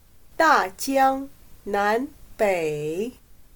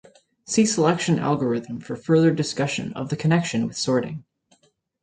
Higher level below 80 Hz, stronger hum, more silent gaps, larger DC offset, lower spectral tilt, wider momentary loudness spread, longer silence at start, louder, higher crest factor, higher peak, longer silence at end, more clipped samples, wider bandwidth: first, -52 dBFS vs -60 dBFS; neither; neither; neither; second, -4 dB/octave vs -5.5 dB/octave; first, 15 LU vs 11 LU; about the same, 0.4 s vs 0.5 s; about the same, -23 LUFS vs -22 LUFS; about the same, 18 dB vs 18 dB; about the same, -6 dBFS vs -6 dBFS; second, 0.15 s vs 0.8 s; neither; first, 19 kHz vs 9.6 kHz